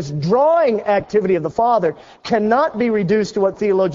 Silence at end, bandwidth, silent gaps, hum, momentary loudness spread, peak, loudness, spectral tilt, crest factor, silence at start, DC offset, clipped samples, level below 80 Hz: 0 s; 7.6 kHz; none; none; 5 LU; -2 dBFS; -17 LUFS; -7 dB/octave; 14 dB; 0 s; under 0.1%; under 0.1%; -52 dBFS